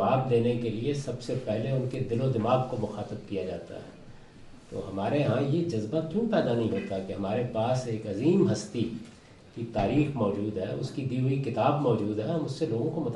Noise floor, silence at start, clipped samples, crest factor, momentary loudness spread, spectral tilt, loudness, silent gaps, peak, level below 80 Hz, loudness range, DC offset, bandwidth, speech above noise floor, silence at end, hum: -48 dBFS; 0 s; under 0.1%; 18 dB; 11 LU; -7.5 dB/octave; -29 LUFS; none; -12 dBFS; -56 dBFS; 3 LU; under 0.1%; 11 kHz; 20 dB; 0 s; none